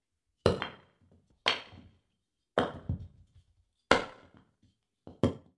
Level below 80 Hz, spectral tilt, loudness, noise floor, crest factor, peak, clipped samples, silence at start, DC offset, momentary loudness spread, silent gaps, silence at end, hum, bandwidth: -58 dBFS; -5 dB/octave; -32 LUFS; -83 dBFS; 30 dB; -6 dBFS; under 0.1%; 0.45 s; under 0.1%; 14 LU; none; 0.2 s; none; 11.5 kHz